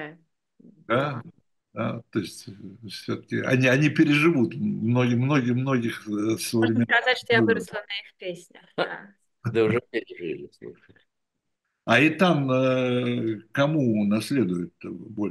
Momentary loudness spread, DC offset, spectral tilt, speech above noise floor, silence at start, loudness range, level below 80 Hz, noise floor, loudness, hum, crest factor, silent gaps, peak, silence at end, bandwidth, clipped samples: 17 LU; under 0.1%; -6 dB/octave; 57 dB; 0 s; 8 LU; -68 dBFS; -82 dBFS; -24 LUFS; none; 20 dB; none; -6 dBFS; 0 s; 12.5 kHz; under 0.1%